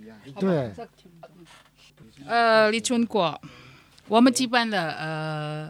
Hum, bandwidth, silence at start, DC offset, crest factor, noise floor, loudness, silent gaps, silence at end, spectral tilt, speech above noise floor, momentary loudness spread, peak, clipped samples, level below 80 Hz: none; 15.5 kHz; 0 s; under 0.1%; 20 dB; -51 dBFS; -23 LUFS; none; 0 s; -4.5 dB/octave; 26 dB; 18 LU; -4 dBFS; under 0.1%; -66 dBFS